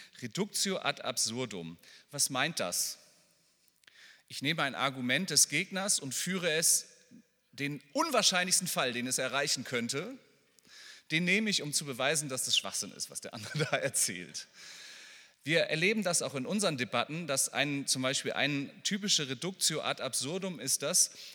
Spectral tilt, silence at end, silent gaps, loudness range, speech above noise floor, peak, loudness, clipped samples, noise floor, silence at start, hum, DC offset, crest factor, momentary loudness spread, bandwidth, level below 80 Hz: -2 dB/octave; 0 s; none; 4 LU; 37 dB; -10 dBFS; -30 LUFS; under 0.1%; -70 dBFS; 0 s; none; under 0.1%; 24 dB; 14 LU; 19 kHz; -84 dBFS